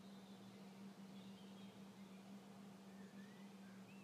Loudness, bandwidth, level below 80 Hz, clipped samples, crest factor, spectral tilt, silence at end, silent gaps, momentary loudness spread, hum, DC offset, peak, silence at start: -59 LUFS; 15 kHz; under -90 dBFS; under 0.1%; 10 dB; -5.5 dB/octave; 0 s; none; 2 LU; none; under 0.1%; -48 dBFS; 0 s